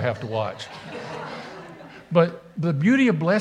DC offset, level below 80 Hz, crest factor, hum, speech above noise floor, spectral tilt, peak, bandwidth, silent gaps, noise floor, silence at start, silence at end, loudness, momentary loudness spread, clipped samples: under 0.1%; -64 dBFS; 20 dB; none; 20 dB; -7.5 dB/octave; -4 dBFS; 9.6 kHz; none; -42 dBFS; 0 s; 0 s; -23 LUFS; 20 LU; under 0.1%